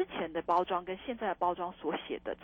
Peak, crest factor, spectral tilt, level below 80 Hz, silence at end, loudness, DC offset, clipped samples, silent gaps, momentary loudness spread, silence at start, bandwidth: -18 dBFS; 18 dB; -7 dB/octave; -64 dBFS; 0 s; -34 LUFS; under 0.1%; under 0.1%; none; 7 LU; 0 s; 17 kHz